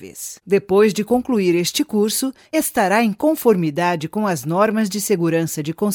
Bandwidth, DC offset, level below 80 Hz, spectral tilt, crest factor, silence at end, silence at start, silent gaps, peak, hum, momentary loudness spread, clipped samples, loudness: 18 kHz; under 0.1%; -58 dBFS; -5 dB/octave; 16 dB; 0 s; 0 s; none; -2 dBFS; none; 6 LU; under 0.1%; -18 LUFS